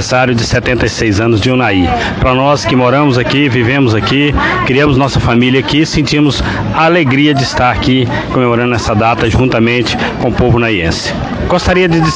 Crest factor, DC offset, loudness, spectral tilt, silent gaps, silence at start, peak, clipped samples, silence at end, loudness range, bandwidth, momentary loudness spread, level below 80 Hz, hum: 10 dB; under 0.1%; -10 LUFS; -5.5 dB/octave; none; 0 s; 0 dBFS; under 0.1%; 0 s; 1 LU; 9.8 kHz; 4 LU; -26 dBFS; none